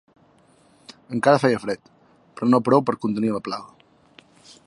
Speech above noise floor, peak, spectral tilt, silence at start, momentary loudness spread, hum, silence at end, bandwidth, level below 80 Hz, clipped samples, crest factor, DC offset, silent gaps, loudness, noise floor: 36 dB; -2 dBFS; -6.5 dB/octave; 0.9 s; 14 LU; none; 1 s; 11.5 kHz; -66 dBFS; under 0.1%; 22 dB; under 0.1%; none; -22 LUFS; -57 dBFS